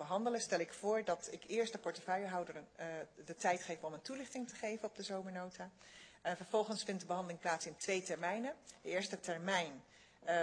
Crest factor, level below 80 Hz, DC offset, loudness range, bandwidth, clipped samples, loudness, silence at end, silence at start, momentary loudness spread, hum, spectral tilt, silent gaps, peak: 20 dB; -82 dBFS; under 0.1%; 3 LU; 10 kHz; under 0.1%; -41 LUFS; 0 s; 0 s; 11 LU; none; -3.5 dB/octave; none; -22 dBFS